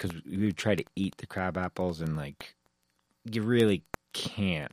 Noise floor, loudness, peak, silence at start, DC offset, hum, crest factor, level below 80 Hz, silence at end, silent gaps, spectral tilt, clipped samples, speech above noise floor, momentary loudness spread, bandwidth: -75 dBFS; -31 LUFS; -10 dBFS; 0 s; under 0.1%; none; 20 dB; -58 dBFS; 0.05 s; none; -6 dB/octave; under 0.1%; 45 dB; 13 LU; 15.5 kHz